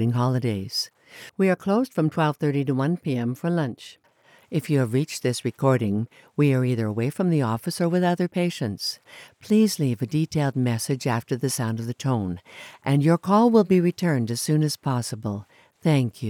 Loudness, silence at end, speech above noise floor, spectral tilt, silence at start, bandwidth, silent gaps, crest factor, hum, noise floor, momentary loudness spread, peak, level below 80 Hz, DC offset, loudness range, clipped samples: -24 LUFS; 0 s; 34 dB; -6.5 dB/octave; 0 s; 18 kHz; none; 18 dB; none; -57 dBFS; 10 LU; -4 dBFS; -66 dBFS; under 0.1%; 3 LU; under 0.1%